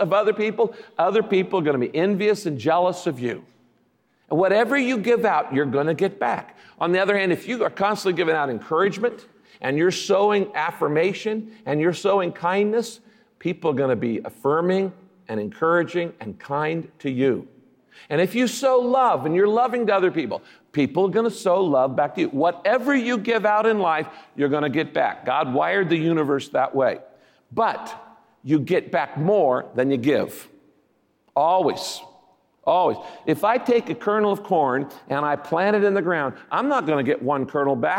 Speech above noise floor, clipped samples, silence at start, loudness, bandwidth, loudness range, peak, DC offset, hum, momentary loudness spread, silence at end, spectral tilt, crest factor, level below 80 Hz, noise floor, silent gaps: 43 dB; under 0.1%; 0 s; -22 LUFS; 17 kHz; 3 LU; -8 dBFS; under 0.1%; none; 9 LU; 0 s; -6 dB/octave; 14 dB; -72 dBFS; -65 dBFS; none